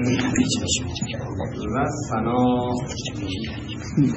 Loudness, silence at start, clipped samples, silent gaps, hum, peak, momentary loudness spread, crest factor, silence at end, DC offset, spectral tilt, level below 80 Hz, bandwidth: -24 LUFS; 0 s; under 0.1%; none; none; -6 dBFS; 8 LU; 16 dB; 0 s; under 0.1%; -5 dB/octave; -44 dBFS; 8.4 kHz